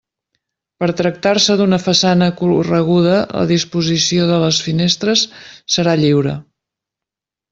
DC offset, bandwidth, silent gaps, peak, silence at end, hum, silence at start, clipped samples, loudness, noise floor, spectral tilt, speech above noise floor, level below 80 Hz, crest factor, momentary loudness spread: under 0.1%; 7.8 kHz; none; 0 dBFS; 1.1 s; none; 0.8 s; under 0.1%; -14 LUFS; -86 dBFS; -4.5 dB/octave; 72 dB; -52 dBFS; 14 dB; 6 LU